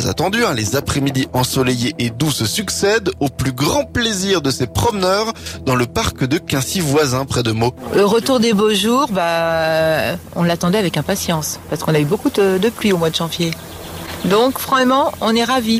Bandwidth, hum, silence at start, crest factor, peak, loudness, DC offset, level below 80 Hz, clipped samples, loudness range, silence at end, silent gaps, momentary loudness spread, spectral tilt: 16 kHz; none; 0 s; 12 dB; -4 dBFS; -17 LUFS; under 0.1%; -40 dBFS; under 0.1%; 2 LU; 0 s; none; 6 LU; -4.5 dB/octave